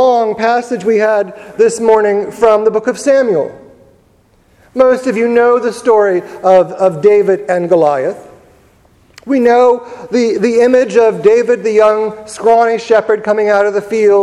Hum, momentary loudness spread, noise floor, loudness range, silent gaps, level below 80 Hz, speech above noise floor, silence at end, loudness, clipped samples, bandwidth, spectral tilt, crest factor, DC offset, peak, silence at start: none; 7 LU; -50 dBFS; 3 LU; none; -54 dBFS; 39 dB; 0 s; -11 LUFS; 0.2%; 11.5 kHz; -5.5 dB/octave; 12 dB; under 0.1%; 0 dBFS; 0 s